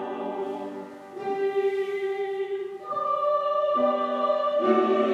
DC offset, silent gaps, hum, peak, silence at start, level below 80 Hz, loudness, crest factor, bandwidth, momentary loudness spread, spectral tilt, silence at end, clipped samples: under 0.1%; none; none; -10 dBFS; 0 s; -80 dBFS; -26 LUFS; 16 dB; 7.6 kHz; 11 LU; -6 dB/octave; 0 s; under 0.1%